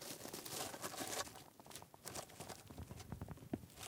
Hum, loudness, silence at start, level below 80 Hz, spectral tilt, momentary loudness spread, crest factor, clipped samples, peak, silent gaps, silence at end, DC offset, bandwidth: none; -49 LUFS; 0 s; -68 dBFS; -3 dB/octave; 11 LU; 24 dB; under 0.1%; -26 dBFS; none; 0 s; under 0.1%; 18 kHz